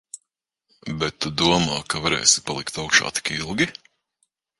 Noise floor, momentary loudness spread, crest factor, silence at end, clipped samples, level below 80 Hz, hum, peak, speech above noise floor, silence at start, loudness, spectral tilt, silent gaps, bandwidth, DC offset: -79 dBFS; 15 LU; 24 dB; 0.9 s; under 0.1%; -50 dBFS; none; 0 dBFS; 57 dB; 0.15 s; -21 LUFS; -2 dB/octave; none; 11.5 kHz; under 0.1%